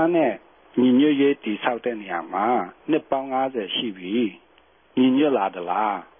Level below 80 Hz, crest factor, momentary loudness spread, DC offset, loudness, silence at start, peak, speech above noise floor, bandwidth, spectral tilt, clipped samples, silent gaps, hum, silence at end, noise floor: -70 dBFS; 16 dB; 10 LU; under 0.1%; -23 LUFS; 0 s; -6 dBFS; 35 dB; 3.7 kHz; -10 dB/octave; under 0.1%; none; none; 0.15 s; -57 dBFS